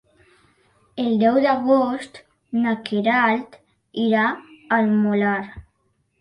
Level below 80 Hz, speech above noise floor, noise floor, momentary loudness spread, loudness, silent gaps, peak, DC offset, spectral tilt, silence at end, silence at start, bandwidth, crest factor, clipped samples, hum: -58 dBFS; 48 dB; -68 dBFS; 15 LU; -20 LUFS; none; -6 dBFS; under 0.1%; -7 dB/octave; 0.6 s; 0.95 s; 10.5 kHz; 16 dB; under 0.1%; none